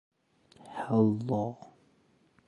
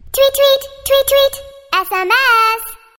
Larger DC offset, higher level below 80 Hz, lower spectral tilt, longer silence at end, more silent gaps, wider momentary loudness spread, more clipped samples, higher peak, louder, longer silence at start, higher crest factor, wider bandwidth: neither; second, -70 dBFS vs -44 dBFS; first, -9.5 dB/octave vs -0.5 dB/octave; first, 0.8 s vs 0.2 s; neither; first, 18 LU vs 8 LU; neither; second, -12 dBFS vs 0 dBFS; second, -30 LUFS vs -13 LUFS; first, 0.65 s vs 0.1 s; first, 20 dB vs 14 dB; second, 10.5 kHz vs 17 kHz